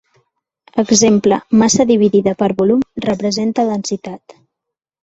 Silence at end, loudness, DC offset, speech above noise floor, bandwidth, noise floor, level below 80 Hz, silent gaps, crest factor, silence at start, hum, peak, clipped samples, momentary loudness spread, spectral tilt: 0.85 s; -14 LUFS; under 0.1%; 67 dB; 8 kHz; -81 dBFS; -52 dBFS; none; 14 dB; 0.75 s; none; -2 dBFS; under 0.1%; 12 LU; -4.5 dB/octave